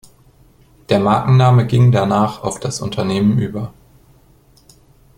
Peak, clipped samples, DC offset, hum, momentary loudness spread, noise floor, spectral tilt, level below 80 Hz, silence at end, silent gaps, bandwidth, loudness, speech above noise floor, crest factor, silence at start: -2 dBFS; under 0.1%; under 0.1%; none; 12 LU; -50 dBFS; -7 dB/octave; -46 dBFS; 1.5 s; none; 11 kHz; -15 LUFS; 36 dB; 16 dB; 0.9 s